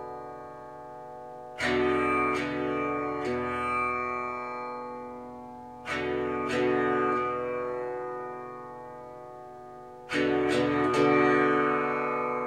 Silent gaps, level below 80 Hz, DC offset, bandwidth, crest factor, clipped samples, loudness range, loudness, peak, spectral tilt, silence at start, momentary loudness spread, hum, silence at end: none; -58 dBFS; under 0.1%; 11.5 kHz; 18 dB; under 0.1%; 6 LU; -28 LUFS; -12 dBFS; -5.5 dB/octave; 0 s; 19 LU; none; 0 s